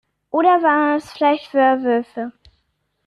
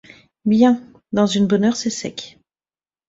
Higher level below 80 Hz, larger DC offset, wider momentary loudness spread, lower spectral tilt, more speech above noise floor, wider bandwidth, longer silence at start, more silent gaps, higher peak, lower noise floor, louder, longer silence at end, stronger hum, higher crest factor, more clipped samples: about the same, -62 dBFS vs -58 dBFS; neither; about the same, 14 LU vs 15 LU; about the same, -5 dB/octave vs -5.5 dB/octave; second, 52 dB vs over 73 dB; first, 11.5 kHz vs 8 kHz; about the same, 0.35 s vs 0.45 s; neither; about the same, -4 dBFS vs -4 dBFS; second, -69 dBFS vs under -90 dBFS; about the same, -17 LUFS vs -18 LUFS; about the same, 0.75 s vs 0.8 s; neither; about the same, 16 dB vs 16 dB; neither